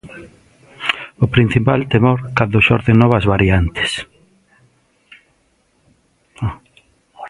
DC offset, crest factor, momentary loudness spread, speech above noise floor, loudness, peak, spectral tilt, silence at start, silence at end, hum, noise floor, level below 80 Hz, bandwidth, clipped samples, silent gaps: under 0.1%; 18 dB; 13 LU; 46 dB; -15 LUFS; 0 dBFS; -7 dB/octave; 0.05 s; 0 s; none; -60 dBFS; -34 dBFS; 11 kHz; under 0.1%; none